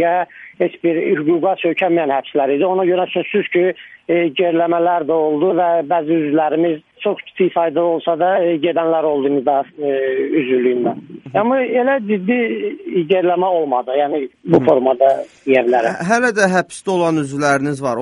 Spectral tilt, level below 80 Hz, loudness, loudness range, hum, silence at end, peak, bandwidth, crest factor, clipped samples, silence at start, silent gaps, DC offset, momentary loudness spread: -6 dB/octave; -64 dBFS; -16 LUFS; 2 LU; none; 0 s; 0 dBFS; 11 kHz; 16 dB; under 0.1%; 0 s; none; under 0.1%; 6 LU